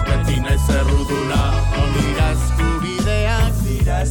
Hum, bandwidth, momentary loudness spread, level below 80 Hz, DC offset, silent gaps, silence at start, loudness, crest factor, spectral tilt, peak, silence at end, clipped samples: none; 18.5 kHz; 2 LU; -20 dBFS; under 0.1%; none; 0 s; -18 LUFS; 12 dB; -5.5 dB/octave; -4 dBFS; 0 s; under 0.1%